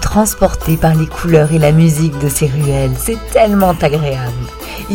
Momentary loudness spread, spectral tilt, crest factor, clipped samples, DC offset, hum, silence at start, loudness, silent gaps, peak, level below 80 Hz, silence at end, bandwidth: 9 LU; -6 dB/octave; 12 dB; 0.2%; under 0.1%; none; 0 s; -13 LUFS; none; 0 dBFS; -26 dBFS; 0 s; 17.5 kHz